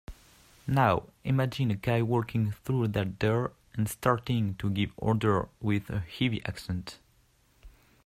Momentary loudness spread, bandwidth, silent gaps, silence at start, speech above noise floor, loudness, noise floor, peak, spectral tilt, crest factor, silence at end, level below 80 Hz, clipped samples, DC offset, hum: 9 LU; 15.5 kHz; none; 0.1 s; 37 dB; -30 LUFS; -65 dBFS; -10 dBFS; -7 dB/octave; 20 dB; 0.35 s; -54 dBFS; under 0.1%; under 0.1%; none